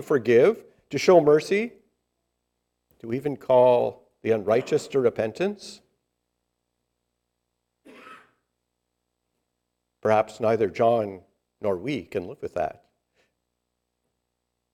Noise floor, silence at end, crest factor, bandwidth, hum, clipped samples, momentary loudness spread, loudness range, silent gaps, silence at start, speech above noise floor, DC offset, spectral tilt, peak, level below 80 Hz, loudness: -80 dBFS; 2.05 s; 20 dB; 14 kHz; 60 Hz at -60 dBFS; under 0.1%; 15 LU; 11 LU; none; 0 s; 57 dB; under 0.1%; -6 dB/octave; -4 dBFS; -68 dBFS; -23 LUFS